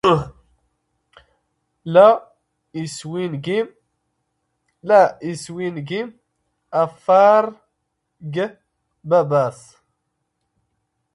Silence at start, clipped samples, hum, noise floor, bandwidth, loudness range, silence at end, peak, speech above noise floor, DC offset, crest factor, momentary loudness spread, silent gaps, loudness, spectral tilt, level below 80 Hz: 0.05 s; under 0.1%; none; -75 dBFS; 11.5 kHz; 4 LU; 1.6 s; 0 dBFS; 57 dB; under 0.1%; 20 dB; 20 LU; none; -18 LUFS; -6 dB/octave; -58 dBFS